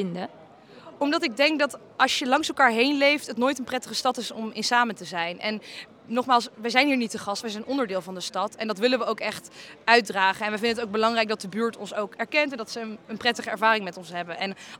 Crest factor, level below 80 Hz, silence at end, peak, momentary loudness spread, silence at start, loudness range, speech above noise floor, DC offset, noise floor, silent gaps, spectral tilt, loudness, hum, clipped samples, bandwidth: 24 dB; -74 dBFS; 0.05 s; -2 dBFS; 12 LU; 0 s; 4 LU; 22 dB; under 0.1%; -48 dBFS; none; -3 dB/octave; -25 LUFS; none; under 0.1%; 18.5 kHz